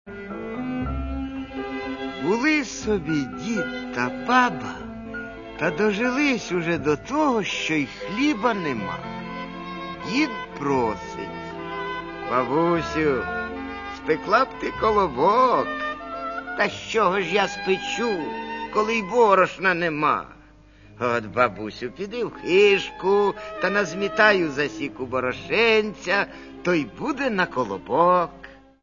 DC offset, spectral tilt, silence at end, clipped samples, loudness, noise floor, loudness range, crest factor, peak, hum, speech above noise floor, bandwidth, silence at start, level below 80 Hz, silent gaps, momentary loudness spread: under 0.1%; -5 dB/octave; 0.25 s; under 0.1%; -23 LUFS; -50 dBFS; 4 LU; 20 dB; -2 dBFS; none; 27 dB; 7.4 kHz; 0.05 s; -46 dBFS; none; 14 LU